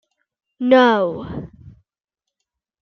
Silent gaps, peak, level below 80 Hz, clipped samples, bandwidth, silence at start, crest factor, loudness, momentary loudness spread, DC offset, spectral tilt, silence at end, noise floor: none; -2 dBFS; -52 dBFS; under 0.1%; 6.6 kHz; 0.6 s; 20 dB; -16 LUFS; 19 LU; under 0.1%; -6.5 dB/octave; 1.15 s; -84 dBFS